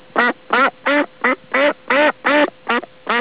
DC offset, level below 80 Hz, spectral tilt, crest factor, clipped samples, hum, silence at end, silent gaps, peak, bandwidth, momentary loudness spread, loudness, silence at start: 0.4%; -66 dBFS; -6.5 dB/octave; 16 dB; under 0.1%; none; 0 s; none; -2 dBFS; 4 kHz; 6 LU; -17 LUFS; 0.15 s